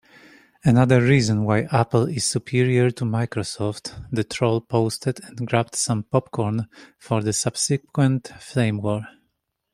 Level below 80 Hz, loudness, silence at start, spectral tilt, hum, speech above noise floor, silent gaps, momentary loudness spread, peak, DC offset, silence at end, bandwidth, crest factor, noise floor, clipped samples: -54 dBFS; -22 LUFS; 0.65 s; -5.5 dB/octave; none; 53 dB; none; 10 LU; -2 dBFS; under 0.1%; 0.65 s; 15 kHz; 20 dB; -74 dBFS; under 0.1%